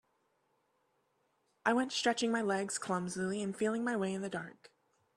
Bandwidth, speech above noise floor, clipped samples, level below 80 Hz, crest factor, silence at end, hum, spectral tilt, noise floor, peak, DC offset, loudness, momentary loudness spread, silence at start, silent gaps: 13 kHz; 43 dB; under 0.1%; -78 dBFS; 22 dB; 0.5 s; none; -4 dB/octave; -77 dBFS; -14 dBFS; under 0.1%; -35 LUFS; 7 LU; 1.65 s; none